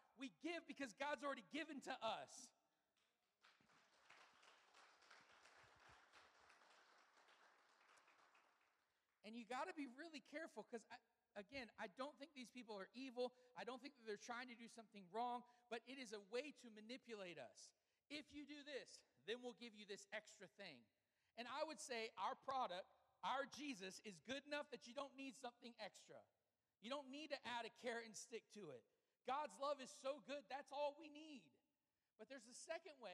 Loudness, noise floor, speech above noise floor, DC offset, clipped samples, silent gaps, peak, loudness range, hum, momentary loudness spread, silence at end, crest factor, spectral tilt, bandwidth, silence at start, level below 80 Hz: -54 LUFS; under -90 dBFS; over 36 dB; under 0.1%; under 0.1%; none; -34 dBFS; 6 LU; none; 16 LU; 0 s; 20 dB; -2.5 dB/octave; 13 kHz; 0.15 s; under -90 dBFS